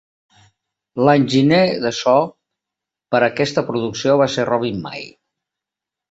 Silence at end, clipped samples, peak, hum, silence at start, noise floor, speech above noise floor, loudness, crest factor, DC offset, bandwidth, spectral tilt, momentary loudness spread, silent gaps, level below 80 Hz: 1.05 s; under 0.1%; -2 dBFS; none; 0.95 s; -86 dBFS; 69 dB; -17 LUFS; 16 dB; under 0.1%; 8 kHz; -5.5 dB/octave; 14 LU; none; -58 dBFS